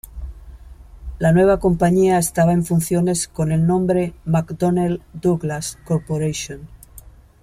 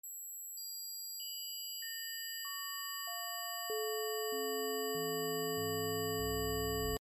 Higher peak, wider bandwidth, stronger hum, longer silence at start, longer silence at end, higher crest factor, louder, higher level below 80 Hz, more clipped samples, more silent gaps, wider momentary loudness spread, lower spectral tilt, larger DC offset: first, -4 dBFS vs -26 dBFS; first, 15 kHz vs 13 kHz; neither; about the same, 0.1 s vs 0.05 s; first, 0.35 s vs 0.05 s; about the same, 14 dB vs 14 dB; first, -19 LUFS vs -38 LUFS; first, -38 dBFS vs -56 dBFS; neither; neither; first, 16 LU vs 6 LU; first, -6.5 dB/octave vs -2.5 dB/octave; neither